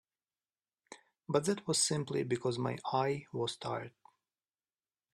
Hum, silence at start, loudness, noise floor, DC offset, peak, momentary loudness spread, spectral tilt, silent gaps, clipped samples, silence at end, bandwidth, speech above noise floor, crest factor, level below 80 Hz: none; 0.9 s; -34 LUFS; under -90 dBFS; under 0.1%; -16 dBFS; 10 LU; -4 dB/octave; none; under 0.1%; 1.25 s; 14 kHz; over 55 dB; 20 dB; -74 dBFS